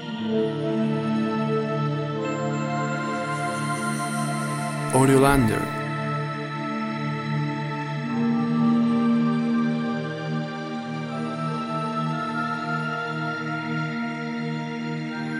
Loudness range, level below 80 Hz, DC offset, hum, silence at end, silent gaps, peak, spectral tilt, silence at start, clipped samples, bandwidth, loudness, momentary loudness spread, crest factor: 5 LU; -48 dBFS; under 0.1%; none; 0 s; none; -4 dBFS; -6 dB/octave; 0 s; under 0.1%; 14 kHz; -25 LUFS; 8 LU; 20 dB